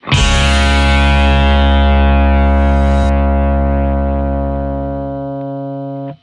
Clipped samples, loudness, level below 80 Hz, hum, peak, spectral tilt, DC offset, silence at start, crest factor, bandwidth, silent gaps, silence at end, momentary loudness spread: under 0.1%; -13 LUFS; -14 dBFS; none; 0 dBFS; -6 dB/octave; under 0.1%; 0.05 s; 12 dB; 11 kHz; none; 0.05 s; 11 LU